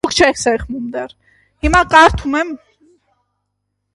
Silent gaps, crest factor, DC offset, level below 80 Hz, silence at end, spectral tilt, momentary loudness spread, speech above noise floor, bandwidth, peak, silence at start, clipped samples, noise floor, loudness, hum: none; 16 dB; under 0.1%; -32 dBFS; 1.4 s; -3.5 dB/octave; 17 LU; 58 dB; 11.5 kHz; 0 dBFS; 0.05 s; under 0.1%; -72 dBFS; -14 LUFS; 50 Hz at -50 dBFS